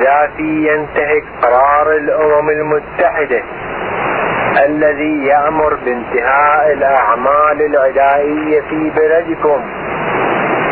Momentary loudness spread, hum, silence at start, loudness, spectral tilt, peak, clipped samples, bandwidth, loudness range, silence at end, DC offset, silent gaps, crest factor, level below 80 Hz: 6 LU; none; 0 s; -13 LUFS; -10 dB/octave; 0 dBFS; under 0.1%; 4.6 kHz; 2 LU; 0 s; under 0.1%; none; 12 dB; -42 dBFS